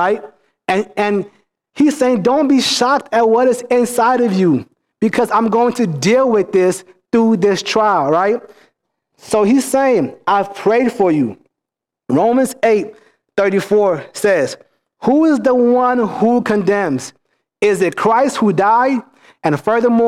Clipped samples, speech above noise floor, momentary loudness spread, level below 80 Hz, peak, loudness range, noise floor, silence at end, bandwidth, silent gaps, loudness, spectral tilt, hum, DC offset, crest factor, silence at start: under 0.1%; 70 dB; 8 LU; -58 dBFS; -4 dBFS; 2 LU; -84 dBFS; 0 s; 15 kHz; none; -15 LUFS; -5 dB/octave; none; under 0.1%; 12 dB; 0 s